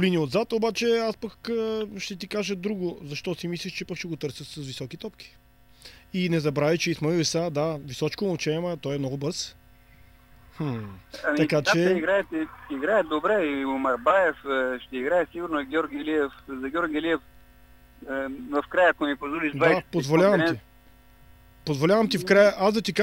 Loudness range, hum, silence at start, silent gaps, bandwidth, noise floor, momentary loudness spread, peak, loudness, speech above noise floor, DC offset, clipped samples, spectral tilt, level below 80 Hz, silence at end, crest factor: 8 LU; none; 0 s; none; 16 kHz; -53 dBFS; 13 LU; -6 dBFS; -26 LUFS; 28 dB; under 0.1%; under 0.1%; -5 dB/octave; -56 dBFS; 0 s; 20 dB